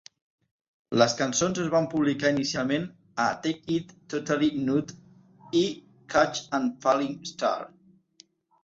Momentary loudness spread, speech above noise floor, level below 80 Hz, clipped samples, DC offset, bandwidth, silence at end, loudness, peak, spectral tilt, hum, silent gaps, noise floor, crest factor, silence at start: 9 LU; 33 dB; -64 dBFS; under 0.1%; under 0.1%; 8 kHz; 0.95 s; -27 LUFS; -6 dBFS; -4.5 dB/octave; none; none; -59 dBFS; 22 dB; 0.9 s